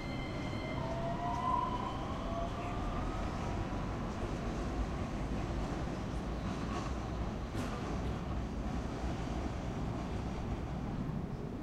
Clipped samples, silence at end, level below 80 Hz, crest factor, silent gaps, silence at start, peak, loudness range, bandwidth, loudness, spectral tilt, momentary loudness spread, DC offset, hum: under 0.1%; 0 s; -42 dBFS; 14 dB; none; 0 s; -22 dBFS; 2 LU; 12 kHz; -39 LUFS; -6.5 dB/octave; 3 LU; under 0.1%; none